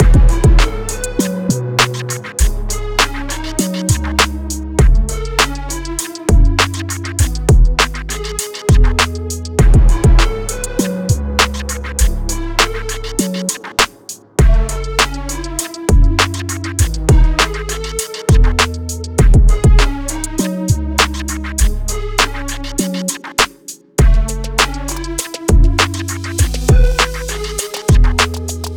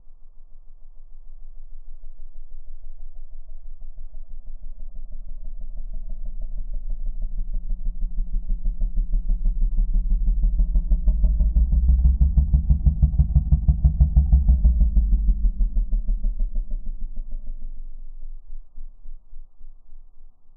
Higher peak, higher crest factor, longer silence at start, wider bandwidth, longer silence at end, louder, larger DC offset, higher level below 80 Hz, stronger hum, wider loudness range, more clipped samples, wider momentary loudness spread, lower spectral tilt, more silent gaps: first, -2 dBFS vs -6 dBFS; about the same, 12 dB vs 16 dB; about the same, 0 s vs 0.05 s; first, 17.5 kHz vs 1 kHz; about the same, 0 s vs 0.05 s; first, -16 LUFS vs -24 LUFS; neither; first, -16 dBFS vs -22 dBFS; neither; second, 3 LU vs 23 LU; neither; second, 9 LU vs 25 LU; second, -4 dB/octave vs -15.5 dB/octave; neither